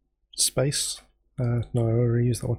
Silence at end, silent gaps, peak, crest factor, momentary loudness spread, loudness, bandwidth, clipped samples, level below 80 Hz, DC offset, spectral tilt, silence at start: 0 s; none; -10 dBFS; 16 dB; 14 LU; -25 LUFS; 16.5 kHz; under 0.1%; -48 dBFS; under 0.1%; -4.5 dB/octave; 0.35 s